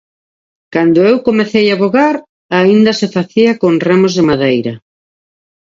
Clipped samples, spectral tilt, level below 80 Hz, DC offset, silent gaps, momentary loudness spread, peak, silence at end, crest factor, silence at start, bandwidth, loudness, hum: under 0.1%; -6 dB/octave; -52 dBFS; under 0.1%; 2.29-2.49 s; 8 LU; 0 dBFS; 0.9 s; 12 dB; 0.7 s; 7.6 kHz; -11 LUFS; none